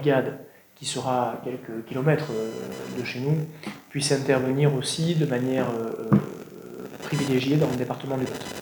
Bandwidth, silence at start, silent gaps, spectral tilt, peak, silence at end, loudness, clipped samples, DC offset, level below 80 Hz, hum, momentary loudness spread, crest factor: over 20 kHz; 0 s; none; -5.5 dB/octave; -4 dBFS; 0 s; -26 LUFS; under 0.1%; under 0.1%; -64 dBFS; none; 12 LU; 20 dB